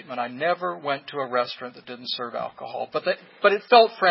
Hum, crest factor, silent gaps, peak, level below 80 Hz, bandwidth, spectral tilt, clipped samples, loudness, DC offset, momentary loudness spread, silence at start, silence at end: none; 22 dB; none; -2 dBFS; -80 dBFS; 5.8 kHz; -8 dB/octave; under 0.1%; -24 LUFS; under 0.1%; 17 LU; 0.1 s; 0 s